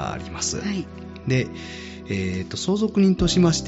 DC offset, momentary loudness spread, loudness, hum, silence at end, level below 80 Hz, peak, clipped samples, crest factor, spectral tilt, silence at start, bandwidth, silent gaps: under 0.1%; 16 LU; -23 LUFS; none; 0 s; -40 dBFS; -8 dBFS; under 0.1%; 14 dB; -5.5 dB/octave; 0 s; 8 kHz; none